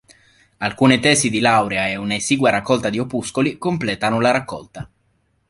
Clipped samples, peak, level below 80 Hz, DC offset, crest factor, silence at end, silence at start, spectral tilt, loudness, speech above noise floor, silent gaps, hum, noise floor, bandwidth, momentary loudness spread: under 0.1%; 0 dBFS; -52 dBFS; under 0.1%; 20 dB; 0.65 s; 0.6 s; -4 dB/octave; -18 LUFS; 46 dB; none; none; -64 dBFS; 11.5 kHz; 14 LU